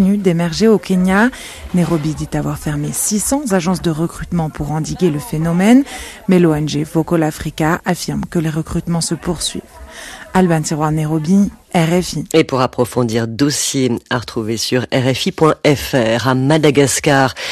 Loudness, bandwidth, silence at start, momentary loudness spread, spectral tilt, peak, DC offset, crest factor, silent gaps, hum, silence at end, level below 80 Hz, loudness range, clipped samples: -15 LUFS; 14 kHz; 0 s; 8 LU; -5 dB/octave; 0 dBFS; under 0.1%; 14 dB; none; none; 0 s; -38 dBFS; 3 LU; under 0.1%